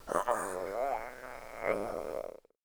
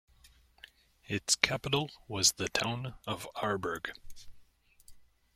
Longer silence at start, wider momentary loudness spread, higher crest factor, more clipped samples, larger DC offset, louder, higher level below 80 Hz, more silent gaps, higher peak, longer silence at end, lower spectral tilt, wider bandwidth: second, 0 s vs 0.25 s; about the same, 13 LU vs 12 LU; second, 22 dB vs 34 dB; neither; neither; second, -36 LUFS vs -32 LUFS; about the same, -58 dBFS vs -60 dBFS; neither; second, -14 dBFS vs -2 dBFS; about the same, 0.3 s vs 0.35 s; first, -4 dB/octave vs -2 dB/octave; first, over 20 kHz vs 16.5 kHz